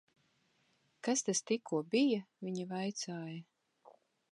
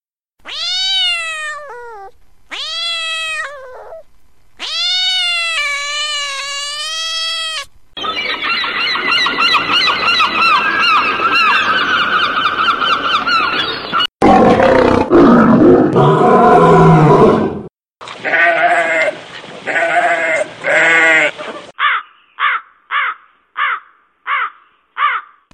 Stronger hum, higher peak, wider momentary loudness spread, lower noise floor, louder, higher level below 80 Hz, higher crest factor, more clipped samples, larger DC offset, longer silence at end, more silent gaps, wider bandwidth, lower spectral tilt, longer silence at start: neither; second, -20 dBFS vs 0 dBFS; second, 12 LU vs 16 LU; first, -75 dBFS vs -51 dBFS; second, -36 LUFS vs -12 LUFS; second, under -90 dBFS vs -42 dBFS; about the same, 18 dB vs 14 dB; neither; neither; about the same, 0.4 s vs 0.35 s; neither; second, 11.5 kHz vs 14 kHz; about the same, -4 dB/octave vs -4.5 dB/octave; first, 1.05 s vs 0.45 s